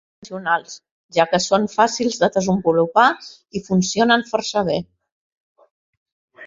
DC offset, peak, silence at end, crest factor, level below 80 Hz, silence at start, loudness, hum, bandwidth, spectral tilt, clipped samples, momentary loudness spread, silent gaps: under 0.1%; -2 dBFS; 0 s; 18 dB; -58 dBFS; 0.2 s; -19 LUFS; none; 7.8 kHz; -4.5 dB/octave; under 0.1%; 15 LU; 0.91-1.09 s, 5.12-5.55 s, 5.71-6.06 s, 6.12-6.28 s